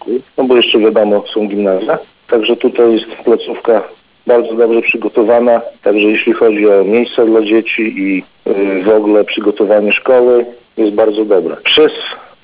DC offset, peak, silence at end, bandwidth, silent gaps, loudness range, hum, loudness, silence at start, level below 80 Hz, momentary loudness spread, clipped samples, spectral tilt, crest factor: 0.1%; 0 dBFS; 0.2 s; 4 kHz; none; 2 LU; none; -11 LUFS; 0.05 s; -56 dBFS; 7 LU; under 0.1%; -9 dB/octave; 10 dB